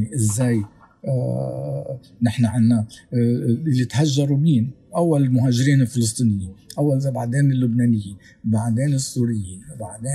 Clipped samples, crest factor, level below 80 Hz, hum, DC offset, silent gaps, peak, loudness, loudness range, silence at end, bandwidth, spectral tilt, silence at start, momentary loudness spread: under 0.1%; 14 dB; -56 dBFS; none; under 0.1%; none; -6 dBFS; -20 LUFS; 3 LU; 0 s; 13 kHz; -6.5 dB/octave; 0 s; 12 LU